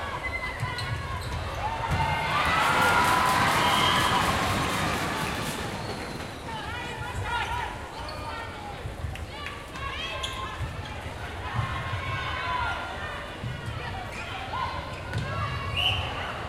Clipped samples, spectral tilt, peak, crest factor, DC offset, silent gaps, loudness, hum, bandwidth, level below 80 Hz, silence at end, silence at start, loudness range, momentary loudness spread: under 0.1%; -4 dB/octave; -10 dBFS; 18 dB; under 0.1%; none; -28 LUFS; none; 16 kHz; -42 dBFS; 0 s; 0 s; 11 LU; 14 LU